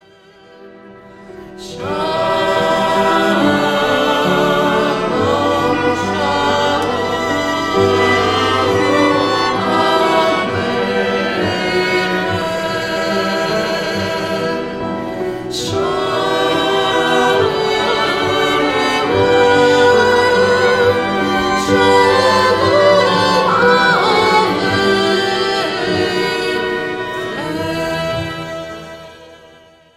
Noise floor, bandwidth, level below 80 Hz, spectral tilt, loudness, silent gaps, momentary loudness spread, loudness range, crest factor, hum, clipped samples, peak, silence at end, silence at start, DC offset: -45 dBFS; 16 kHz; -44 dBFS; -4.5 dB/octave; -14 LUFS; none; 10 LU; 6 LU; 14 dB; none; under 0.1%; 0 dBFS; 0.6 s; 0.6 s; under 0.1%